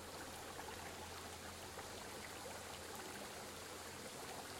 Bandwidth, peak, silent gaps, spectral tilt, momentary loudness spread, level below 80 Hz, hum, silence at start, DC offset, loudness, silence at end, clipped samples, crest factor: 16.5 kHz; -36 dBFS; none; -2.5 dB/octave; 1 LU; -72 dBFS; none; 0 s; under 0.1%; -50 LUFS; 0 s; under 0.1%; 16 dB